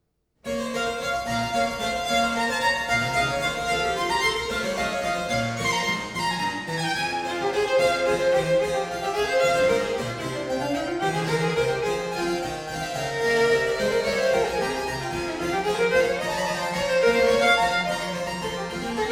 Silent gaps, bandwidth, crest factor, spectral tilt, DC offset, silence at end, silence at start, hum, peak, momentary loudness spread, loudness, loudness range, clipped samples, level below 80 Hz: none; 17.5 kHz; 16 dB; -3.5 dB/octave; under 0.1%; 0 s; 0.45 s; none; -8 dBFS; 8 LU; -24 LUFS; 3 LU; under 0.1%; -48 dBFS